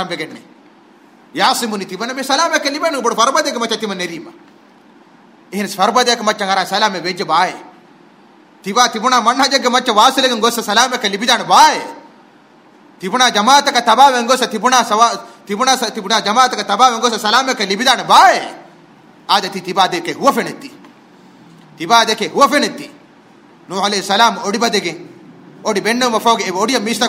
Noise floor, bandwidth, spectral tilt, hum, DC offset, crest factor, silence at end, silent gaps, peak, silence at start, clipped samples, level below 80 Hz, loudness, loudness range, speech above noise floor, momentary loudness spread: -46 dBFS; 16.5 kHz; -2 dB/octave; none; under 0.1%; 16 dB; 0 s; none; 0 dBFS; 0 s; 0.1%; -62 dBFS; -13 LUFS; 6 LU; 32 dB; 14 LU